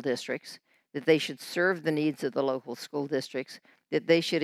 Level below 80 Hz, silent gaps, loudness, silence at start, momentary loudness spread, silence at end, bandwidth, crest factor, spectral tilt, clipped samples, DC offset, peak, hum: -84 dBFS; none; -29 LUFS; 0 s; 15 LU; 0 s; 15 kHz; 20 dB; -5 dB/octave; under 0.1%; under 0.1%; -10 dBFS; none